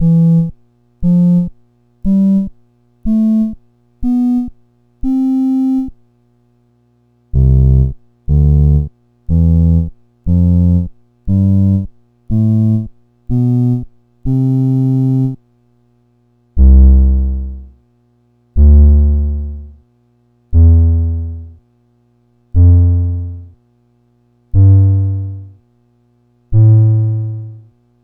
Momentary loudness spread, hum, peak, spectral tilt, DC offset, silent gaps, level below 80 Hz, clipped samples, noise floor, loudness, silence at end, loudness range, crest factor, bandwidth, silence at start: 17 LU; 60 Hz at -50 dBFS; 0 dBFS; -12.5 dB/octave; under 0.1%; none; -18 dBFS; under 0.1%; -55 dBFS; -13 LUFS; 0.45 s; 4 LU; 12 dB; 1.4 kHz; 0 s